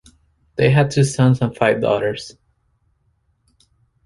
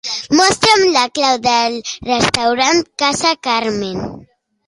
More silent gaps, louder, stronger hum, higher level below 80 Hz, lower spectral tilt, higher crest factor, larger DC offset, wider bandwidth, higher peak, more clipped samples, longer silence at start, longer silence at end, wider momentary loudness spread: neither; second, -17 LUFS vs -14 LUFS; neither; about the same, -50 dBFS vs -46 dBFS; first, -6.5 dB/octave vs -2.5 dB/octave; about the same, 18 dB vs 16 dB; neither; about the same, 11.5 kHz vs 11.5 kHz; about the same, -2 dBFS vs 0 dBFS; neither; first, 0.6 s vs 0.05 s; first, 1.75 s vs 0.45 s; first, 16 LU vs 11 LU